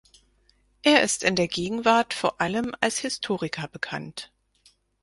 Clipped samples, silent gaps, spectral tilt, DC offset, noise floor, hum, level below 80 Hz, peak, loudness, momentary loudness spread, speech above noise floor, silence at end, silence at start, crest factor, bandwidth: under 0.1%; none; -3 dB/octave; under 0.1%; -64 dBFS; none; -60 dBFS; -4 dBFS; -24 LUFS; 13 LU; 38 dB; 0.75 s; 0.85 s; 22 dB; 11.5 kHz